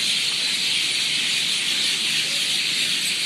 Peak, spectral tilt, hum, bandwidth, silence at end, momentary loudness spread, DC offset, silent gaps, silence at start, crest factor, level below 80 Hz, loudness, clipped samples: -8 dBFS; 1 dB/octave; none; 15.5 kHz; 0 s; 1 LU; under 0.1%; none; 0 s; 14 dB; -72 dBFS; -19 LUFS; under 0.1%